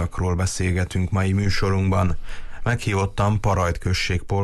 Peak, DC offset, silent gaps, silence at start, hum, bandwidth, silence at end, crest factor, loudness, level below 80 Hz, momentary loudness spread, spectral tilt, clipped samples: -10 dBFS; under 0.1%; none; 0 s; none; 12.5 kHz; 0 s; 12 dB; -22 LUFS; -30 dBFS; 5 LU; -5.5 dB/octave; under 0.1%